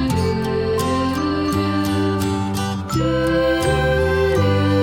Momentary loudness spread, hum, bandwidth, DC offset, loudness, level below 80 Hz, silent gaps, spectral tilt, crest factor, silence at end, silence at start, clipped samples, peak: 4 LU; none; 17.5 kHz; under 0.1%; -19 LUFS; -34 dBFS; none; -6 dB/octave; 12 dB; 0 s; 0 s; under 0.1%; -6 dBFS